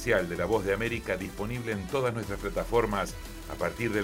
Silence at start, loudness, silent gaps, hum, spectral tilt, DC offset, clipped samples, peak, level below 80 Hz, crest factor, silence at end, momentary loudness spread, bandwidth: 0 s; -30 LUFS; none; none; -5.5 dB/octave; under 0.1%; under 0.1%; -12 dBFS; -44 dBFS; 18 dB; 0 s; 7 LU; 16 kHz